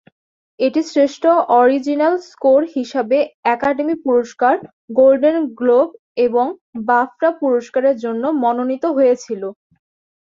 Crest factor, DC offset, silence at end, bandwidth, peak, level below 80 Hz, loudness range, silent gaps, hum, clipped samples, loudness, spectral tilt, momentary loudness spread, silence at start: 14 dB; under 0.1%; 0.75 s; 7.6 kHz; -2 dBFS; -62 dBFS; 2 LU; 3.34-3.43 s, 4.73-4.88 s, 5.99-6.15 s, 6.61-6.73 s; none; under 0.1%; -16 LUFS; -5 dB/octave; 8 LU; 0.6 s